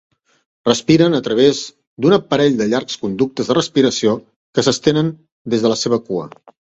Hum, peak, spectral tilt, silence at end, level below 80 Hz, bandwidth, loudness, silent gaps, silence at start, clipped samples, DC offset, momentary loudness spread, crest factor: none; 0 dBFS; -5 dB/octave; 0.45 s; -56 dBFS; 8.2 kHz; -16 LUFS; 1.87-1.97 s, 4.36-4.53 s, 5.32-5.45 s; 0.65 s; under 0.1%; under 0.1%; 11 LU; 16 dB